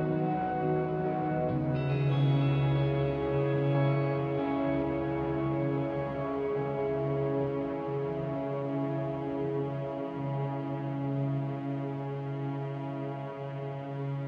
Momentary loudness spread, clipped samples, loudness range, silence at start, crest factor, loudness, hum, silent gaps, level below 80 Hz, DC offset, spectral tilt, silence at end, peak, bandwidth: 8 LU; under 0.1%; 6 LU; 0 s; 14 dB; -31 LUFS; none; none; -54 dBFS; under 0.1%; -10 dB/octave; 0 s; -18 dBFS; 4.7 kHz